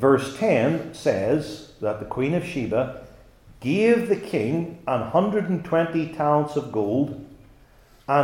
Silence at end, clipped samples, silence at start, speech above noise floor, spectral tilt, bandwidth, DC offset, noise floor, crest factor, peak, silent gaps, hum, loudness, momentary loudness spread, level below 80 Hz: 0 s; under 0.1%; 0 s; 30 dB; -7 dB/octave; 16 kHz; under 0.1%; -53 dBFS; 18 dB; -6 dBFS; none; none; -24 LUFS; 9 LU; -54 dBFS